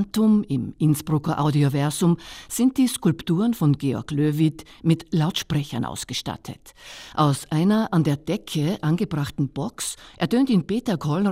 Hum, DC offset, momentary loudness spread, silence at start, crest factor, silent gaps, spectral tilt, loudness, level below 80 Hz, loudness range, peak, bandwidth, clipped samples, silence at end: none; under 0.1%; 9 LU; 0 s; 16 dB; none; -6 dB/octave; -23 LUFS; -52 dBFS; 3 LU; -6 dBFS; 16 kHz; under 0.1%; 0 s